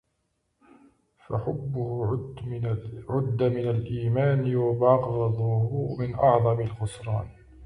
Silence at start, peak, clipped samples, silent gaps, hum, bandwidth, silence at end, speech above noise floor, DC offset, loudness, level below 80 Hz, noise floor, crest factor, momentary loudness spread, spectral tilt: 1.3 s; -8 dBFS; under 0.1%; none; none; 10.5 kHz; 0 s; 50 dB; under 0.1%; -26 LUFS; -52 dBFS; -75 dBFS; 18 dB; 10 LU; -9 dB/octave